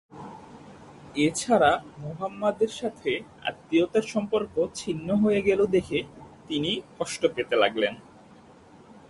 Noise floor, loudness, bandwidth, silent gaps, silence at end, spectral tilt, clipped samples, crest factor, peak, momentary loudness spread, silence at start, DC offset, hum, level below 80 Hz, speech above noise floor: -52 dBFS; -26 LUFS; 11.5 kHz; none; 0.15 s; -4.5 dB/octave; under 0.1%; 20 dB; -8 dBFS; 15 LU; 0.15 s; under 0.1%; none; -58 dBFS; 26 dB